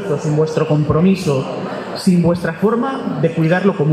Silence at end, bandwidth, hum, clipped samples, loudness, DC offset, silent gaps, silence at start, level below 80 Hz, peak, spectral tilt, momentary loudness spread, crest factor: 0 s; 13.5 kHz; none; under 0.1%; -16 LUFS; under 0.1%; none; 0 s; -46 dBFS; -2 dBFS; -7.5 dB/octave; 6 LU; 14 dB